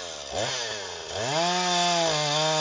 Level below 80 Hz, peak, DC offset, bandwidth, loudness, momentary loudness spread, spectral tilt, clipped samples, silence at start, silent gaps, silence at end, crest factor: -58 dBFS; -12 dBFS; under 0.1%; 7.8 kHz; -25 LUFS; 10 LU; -2 dB/octave; under 0.1%; 0 s; none; 0 s; 14 dB